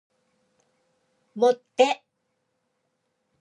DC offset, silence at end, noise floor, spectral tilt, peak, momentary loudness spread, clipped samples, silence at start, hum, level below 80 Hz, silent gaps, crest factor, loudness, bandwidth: under 0.1%; 1.45 s; -76 dBFS; -3 dB/octave; -6 dBFS; 12 LU; under 0.1%; 1.35 s; none; -86 dBFS; none; 24 dB; -23 LUFS; 10.5 kHz